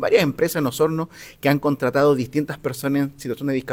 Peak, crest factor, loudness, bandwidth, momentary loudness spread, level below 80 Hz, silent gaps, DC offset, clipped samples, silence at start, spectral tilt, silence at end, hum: -4 dBFS; 16 dB; -21 LUFS; 17 kHz; 9 LU; -54 dBFS; none; under 0.1%; under 0.1%; 0 s; -6 dB/octave; 0 s; none